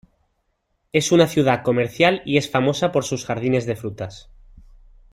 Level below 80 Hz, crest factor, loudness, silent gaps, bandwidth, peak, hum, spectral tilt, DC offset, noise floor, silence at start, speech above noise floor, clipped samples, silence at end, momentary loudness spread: -52 dBFS; 20 dB; -20 LUFS; none; 16 kHz; -2 dBFS; none; -5 dB/octave; under 0.1%; -70 dBFS; 0.95 s; 51 dB; under 0.1%; 0.9 s; 12 LU